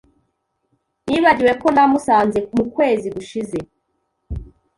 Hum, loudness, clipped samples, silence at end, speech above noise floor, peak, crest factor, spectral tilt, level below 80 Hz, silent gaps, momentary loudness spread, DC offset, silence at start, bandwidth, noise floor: none; -17 LUFS; under 0.1%; 0.35 s; 54 dB; -2 dBFS; 18 dB; -6 dB/octave; -42 dBFS; none; 19 LU; under 0.1%; 1.05 s; 11.5 kHz; -71 dBFS